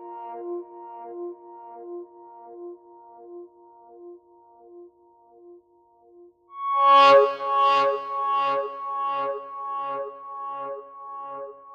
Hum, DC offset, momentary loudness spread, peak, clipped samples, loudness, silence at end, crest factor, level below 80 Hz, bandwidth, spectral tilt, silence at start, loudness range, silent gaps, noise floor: none; under 0.1%; 26 LU; -6 dBFS; under 0.1%; -22 LUFS; 0 s; 20 dB; -86 dBFS; 15.5 kHz; -3.5 dB/octave; 0 s; 22 LU; none; -59 dBFS